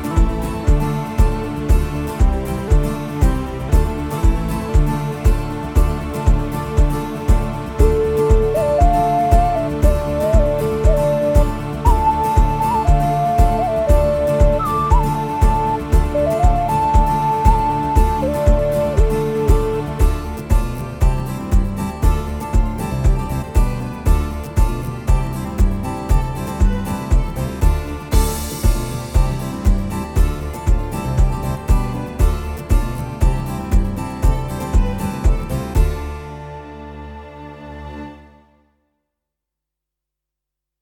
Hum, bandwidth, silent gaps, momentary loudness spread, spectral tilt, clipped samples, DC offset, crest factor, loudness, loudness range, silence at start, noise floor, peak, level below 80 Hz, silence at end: none; 16.5 kHz; none; 8 LU; -7 dB/octave; under 0.1%; under 0.1%; 16 dB; -19 LUFS; 5 LU; 0 s; -83 dBFS; 0 dBFS; -18 dBFS; 2.65 s